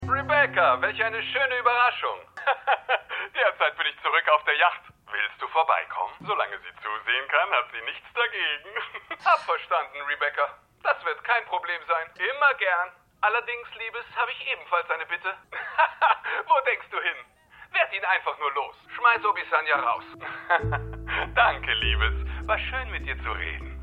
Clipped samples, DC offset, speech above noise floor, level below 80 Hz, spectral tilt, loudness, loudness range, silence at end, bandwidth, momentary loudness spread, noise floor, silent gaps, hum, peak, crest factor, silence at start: under 0.1%; under 0.1%; 26 dB; -42 dBFS; -5.5 dB/octave; -25 LUFS; 3 LU; 0 s; 8.6 kHz; 11 LU; -52 dBFS; none; none; -6 dBFS; 20 dB; 0 s